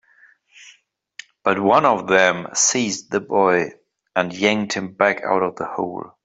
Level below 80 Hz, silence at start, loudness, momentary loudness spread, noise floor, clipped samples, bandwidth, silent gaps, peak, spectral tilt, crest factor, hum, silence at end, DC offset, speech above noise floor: -64 dBFS; 0.6 s; -19 LUFS; 10 LU; -55 dBFS; under 0.1%; 8.2 kHz; none; -2 dBFS; -3 dB/octave; 18 dB; none; 0.15 s; under 0.1%; 36 dB